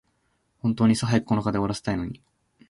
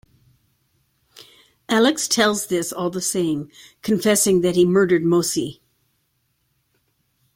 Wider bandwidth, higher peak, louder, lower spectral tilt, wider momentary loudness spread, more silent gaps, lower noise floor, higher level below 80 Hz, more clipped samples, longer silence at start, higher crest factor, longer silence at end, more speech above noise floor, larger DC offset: second, 11.5 kHz vs 16.5 kHz; second, -8 dBFS vs -4 dBFS; second, -25 LUFS vs -19 LUFS; first, -6.5 dB/octave vs -4 dB/octave; about the same, 10 LU vs 10 LU; neither; about the same, -70 dBFS vs -69 dBFS; first, -50 dBFS vs -60 dBFS; neither; second, 0.65 s vs 1.7 s; about the same, 18 dB vs 18 dB; second, 0.55 s vs 1.85 s; about the same, 47 dB vs 50 dB; neither